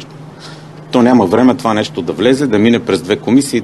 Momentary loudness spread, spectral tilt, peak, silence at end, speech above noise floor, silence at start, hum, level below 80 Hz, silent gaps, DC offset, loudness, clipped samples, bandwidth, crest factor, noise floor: 22 LU; -5.5 dB/octave; 0 dBFS; 0 s; 21 dB; 0 s; none; -50 dBFS; none; 0.2%; -12 LUFS; 0.1%; 12.5 kHz; 12 dB; -32 dBFS